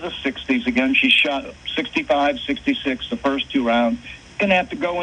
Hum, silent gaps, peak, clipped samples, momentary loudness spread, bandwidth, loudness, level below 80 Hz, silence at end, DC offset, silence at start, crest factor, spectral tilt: none; none; -2 dBFS; under 0.1%; 11 LU; 9.4 kHz; -19 LUFS; -48 dBFS; 0 s; under 0.1%; 0 s; 18 dB; -4.5 dB/octave